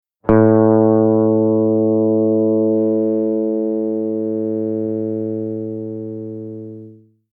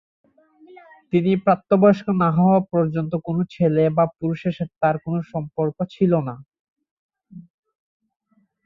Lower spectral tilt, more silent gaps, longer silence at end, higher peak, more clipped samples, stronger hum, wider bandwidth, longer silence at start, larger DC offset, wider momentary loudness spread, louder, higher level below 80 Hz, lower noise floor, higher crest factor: first, -13.5 dB/octave vs -10 dB/octave; second, none vs 6.59-6.76 s, 6.91-7.09 s; second, 0.4 s vs 1.25 s; about the same, -2 dBFS vs -4 dBFS; neither; neither; second, 2.5 kHz vs 6 kHz; second, 0.25 s vs 1.15 s; neither; first, 15 LU vs 10 LU; first, -17 LUFS vs -20 LUFS; first, -50 dBFS vs -60 dBFS; second, -42 dBFS vs -51 dBFS; about the same, 14 dB vs 18 dB